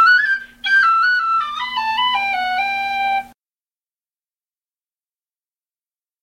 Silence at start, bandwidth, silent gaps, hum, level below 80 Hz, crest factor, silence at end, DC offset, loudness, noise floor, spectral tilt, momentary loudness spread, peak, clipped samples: 0 s; 16 kHz; none; none; -60 dBFS; 16 dB; 2.95 s; under 0.1%; -17 LUFS; under -90 dBFS; 0 dB/octave; 8 LU; -4 dBFS; under 0.1%